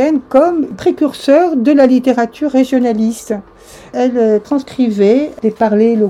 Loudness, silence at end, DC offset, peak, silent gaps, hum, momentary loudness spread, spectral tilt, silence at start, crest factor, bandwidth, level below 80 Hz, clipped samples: -13 LUFS; 0 s; under 0.1%; 0 dBFS; none; none; 7 LU; -6.5 dB/octave; 0 s; 12 dB; 13 kHz; -50 dBFS; 0.2%